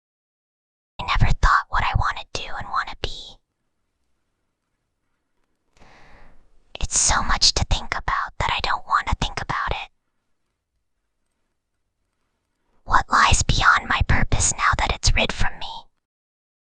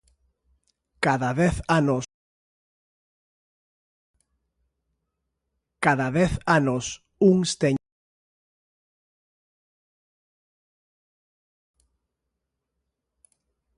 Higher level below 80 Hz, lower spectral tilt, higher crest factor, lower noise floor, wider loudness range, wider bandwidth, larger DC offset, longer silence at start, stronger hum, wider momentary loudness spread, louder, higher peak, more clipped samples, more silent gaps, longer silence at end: first, -28 dBFS vs -50 dBFS; second, -2 dB/octave vs -5.5 dB/octave; about the same, 22 dB vs 24 dB; second, -75 dBFS vs -82 dBFS; first, 14 LU vs 8 LU; second, 10 kHz vs 11.5 kHz; neither; about the same, 1 s vs 1 s; neither; first, 15 LU vs 9 LU; about the same, -21 LUFS vs -23 LUFS; about the same, -2 dBFS vs -4 dBFS; neither; second, none vs 2.14-4.14 s; second, 0.8 s vs 6 s